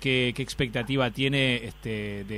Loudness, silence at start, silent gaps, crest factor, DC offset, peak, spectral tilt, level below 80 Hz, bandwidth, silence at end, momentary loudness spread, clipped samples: -27 LUFS; 0 s; none; 16 dB; under 0.1%; -12 dBFS; -5.5 dB/octave; -48 dBFS; 15.5 kHz; 0 s; 9 LU; under 0.1%